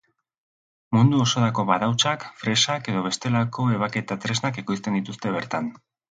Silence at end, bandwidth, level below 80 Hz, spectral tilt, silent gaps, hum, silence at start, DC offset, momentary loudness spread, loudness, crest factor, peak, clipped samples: 0.35 s; 9.4 kHz; -60 dBFS; -4.5 dB/octave; none; none; 0.9 s; under 0.1%; 8 LU; -23 LUFS; 20 dB; -4 dBFS; under 0.1%